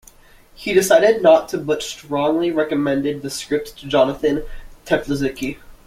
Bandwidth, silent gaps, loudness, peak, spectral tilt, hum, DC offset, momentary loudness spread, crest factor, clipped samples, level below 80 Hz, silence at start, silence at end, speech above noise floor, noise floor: 16 kHz; none; -19 LUFS; -2 dBFS; -4.5 dB/octave; none; under 0.1%; 11 LU; 18 dB; under 0.1%; -42 dBFS; 0.6 s; 0.15 s; 30 dB; -48 dBFS